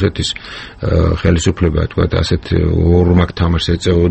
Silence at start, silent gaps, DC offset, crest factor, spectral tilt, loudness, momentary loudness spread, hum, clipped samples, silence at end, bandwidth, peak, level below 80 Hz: 0 s; none; under 0.1%; 12 dB; -6.5 dB/octave; -14 LUFS; 8 LU; none; under 0.1%; 0 s; 8.6 kHz; 0 dBFS; -24 dBFS